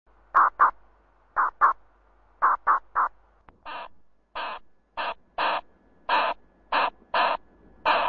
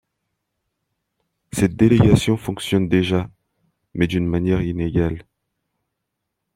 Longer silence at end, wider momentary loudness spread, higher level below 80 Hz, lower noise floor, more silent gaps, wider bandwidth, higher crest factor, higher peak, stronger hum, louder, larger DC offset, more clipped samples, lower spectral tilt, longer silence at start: second, 0 s vs 1.35 s; first, 18 LU vs 13 LU; second, -60 dBFS vs -42 dBFS; second, -60 dBFS vs -79 dBFS; neither; second, 6.6 kHz vs 16 kHz; about the same, 20 dB vs 18 dB; second, -8 dBFS vs -2 dBFS; neither; second, -25 LUFS vs -19 LUFS; neither; neither; second, -4 dB/octave vs -7 dB/octave; second, 0.35 s vs 1.55 s